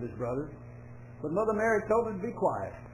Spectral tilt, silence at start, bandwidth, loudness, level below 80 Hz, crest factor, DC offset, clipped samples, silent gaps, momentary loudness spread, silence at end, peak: -8 dB/octave; 0 s; 15 kHz; -31 LUFS; -54 dBFS; 16 dB; under 0.1%; under 0.1%; none; 21 LU; 0 s; -16 dBFS